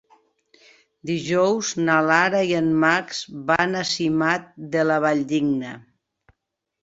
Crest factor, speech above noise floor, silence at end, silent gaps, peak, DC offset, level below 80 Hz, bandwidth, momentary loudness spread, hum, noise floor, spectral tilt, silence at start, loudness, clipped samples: 20 dB; 59 dB; 1 s; none; -2 dBFS; under 0.1%; -62 dBFS; 8 kHz; 10 LU; none; -80 dBFS; -4.5 dB/octave; 1.05 s; -21 LUFS; under 0.1%